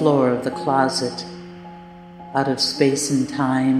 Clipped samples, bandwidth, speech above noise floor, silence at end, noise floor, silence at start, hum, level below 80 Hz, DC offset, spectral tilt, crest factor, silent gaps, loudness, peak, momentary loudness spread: under 0.1%; 14 kHz; 21 dB; 0 s; -40 dBFS; 0 s; none; -58 dBFS; under 0.1%; -4.5 dB/octave; 18 dB; none; -20 LUFS; -2 dBFS; 21 LU